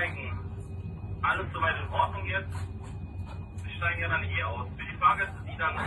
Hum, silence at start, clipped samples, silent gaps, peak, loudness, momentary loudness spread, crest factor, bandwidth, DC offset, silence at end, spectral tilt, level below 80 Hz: none; 0 s; under 0.1%; none; -12 dBFS; -31 LUFS; 14 LU; 20 dB; 11 kHz; under 0.1%; 0 s; -6 dB/octave; -46 dBFS